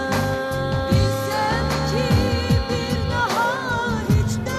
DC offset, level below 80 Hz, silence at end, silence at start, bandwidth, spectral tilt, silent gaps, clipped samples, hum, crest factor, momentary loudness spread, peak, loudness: under 0.1%; -32 dBFS; 0 s; 0 s; 14 kHz; -5.5 dB/octave; none; under 0.1%; none; 14 dB; 4 LU; -6 dBFS; -21 LUFS